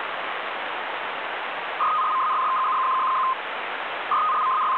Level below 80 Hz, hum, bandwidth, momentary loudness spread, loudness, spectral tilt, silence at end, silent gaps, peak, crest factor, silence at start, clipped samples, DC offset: -78 dBFS; none; 4.9 kHz; 7 LU; -24 LUFS; -4 dB/octave; 0 s; none; -14 dBFS; 10 dB; 0 s; under 0.1%; under 0.1%